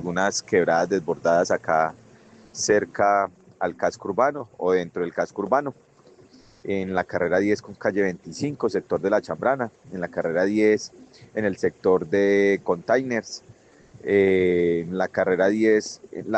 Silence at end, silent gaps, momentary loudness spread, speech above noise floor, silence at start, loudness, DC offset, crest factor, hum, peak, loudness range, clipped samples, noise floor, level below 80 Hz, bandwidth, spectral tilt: 0 s; none; 10 LU; 30 dB; 0 s; -23 LUFS; under 0.1%; 18 dB; none; -6 dBFS; 4 LU; under 0.1%; -52 dBFS; -64 dBFS; 8.6 kHz; -5 dB/octave